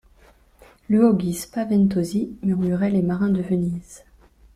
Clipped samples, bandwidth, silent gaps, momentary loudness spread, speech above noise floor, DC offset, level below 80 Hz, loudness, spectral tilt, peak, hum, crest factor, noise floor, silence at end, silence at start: under 0.1%; 14.5 kHz; none; 8 LU; 33 dB; under 0.1%; -52 dBFS; -21 LUFS; -7.5 dB/octave; -6 dBFS; none; 16 dB; -54 dBFS; 0.6 s; 0.9 s